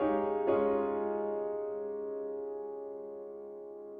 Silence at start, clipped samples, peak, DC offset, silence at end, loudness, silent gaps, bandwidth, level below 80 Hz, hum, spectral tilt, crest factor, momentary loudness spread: 0 s; under 0.1%; -18 dBFS; under 0.1%; 0 s; -35 LUFS; none; 3.6 kHz; -68 dBFS; none; -6.5 dB/octave; 18 dB; 15 LU